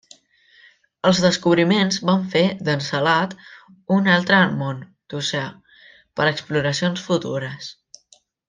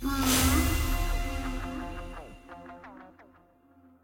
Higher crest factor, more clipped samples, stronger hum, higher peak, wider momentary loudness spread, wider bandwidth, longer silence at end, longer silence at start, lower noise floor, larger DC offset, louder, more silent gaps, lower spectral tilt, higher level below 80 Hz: about the same, 18 dB vs 18 dB; neither; neither; first, -2 dBFS vs -12 dBFS; second, 16 LU vs 24 LU; second, 9.4 kHz vs 17 kHz; about the same, 0.75 s vs 0.8 s; first, 1.05 s vs 0 s; about the same, -57 dBFS vs -60 dBFS; neither; first, -20 LUFS vs -28 LUFS; neither; about the same, -5 dB/octave vs -4 dB/octave; second, -60 dBFS vs -34 dBFS